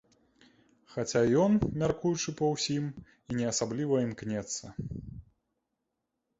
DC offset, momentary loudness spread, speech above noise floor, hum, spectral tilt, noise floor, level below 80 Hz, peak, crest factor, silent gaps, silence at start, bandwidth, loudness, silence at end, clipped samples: under 0.1%; 16 LU; 54 dB; none; -5 dB/octave; -84 dBFS; -56 dBFS; -14 dBFS; 18 dB; none; 0.9 s; 8.2 kHz; -30 LUFS; 1.2 s; under 0.1%